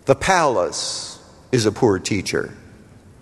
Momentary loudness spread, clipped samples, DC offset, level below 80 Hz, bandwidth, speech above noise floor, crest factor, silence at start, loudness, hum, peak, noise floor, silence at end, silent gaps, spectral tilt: 15 LU; under 0.1%; under 0.1%; -48 dBFS; 12.5 kHz; 27 dB; 20 dB; 0.05 s; -20 LUFS; none; 0 dBFS; -46 dBFS; 0.6 s; none; -4 dB/octave